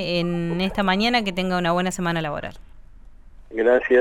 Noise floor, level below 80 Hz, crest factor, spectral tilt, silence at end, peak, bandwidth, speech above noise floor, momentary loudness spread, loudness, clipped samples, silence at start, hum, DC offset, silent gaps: -43 dBFS; -44 dBFS; 16 dB; -5.5 dB/octave; 0 s; -6 dBFS; 13.5 kHz; 22 dB; 10 LU; -22 LUFS; under 0.1%; 0 s; none; under 0.1%; none